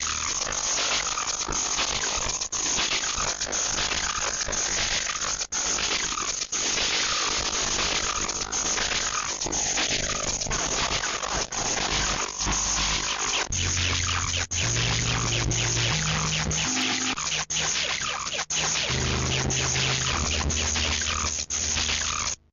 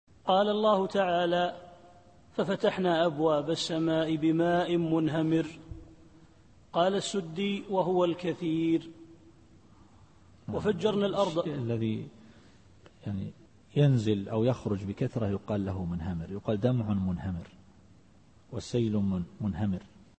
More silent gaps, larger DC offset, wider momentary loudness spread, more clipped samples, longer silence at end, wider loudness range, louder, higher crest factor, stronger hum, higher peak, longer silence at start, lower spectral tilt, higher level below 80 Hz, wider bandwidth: neither; neither; second, 3 LU vs 12 LU; neither; second, 0.15 s vs 0.35 s; second, 1 LU vs 5 LU; first, -24 LUFS vs -29 LUFS; about the same, 14 dB vs 18 dB; neither; about the same, -14 dBFS vs -12 dBFS; second, 0 s vs 0.25 s; second, -1.5 dB/octave vs -6.5 dB/octave; first, -40 dBFS vs -58 dBFS; about the same, 8.2 kHz vs 8.8 kHz